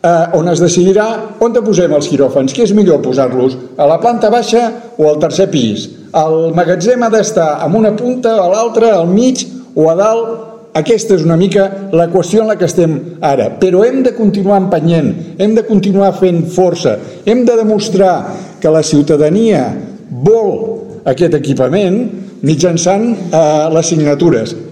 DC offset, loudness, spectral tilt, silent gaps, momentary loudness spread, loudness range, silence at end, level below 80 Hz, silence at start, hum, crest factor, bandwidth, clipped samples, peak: 0.2%; -11 LUFS; -6 dB/octave; none; 7 LU; 1 LU; 0 s; -48 dBFS; 0.05 s; none; 10 dB; 12 kHz; under 0.1%; 0 dBFS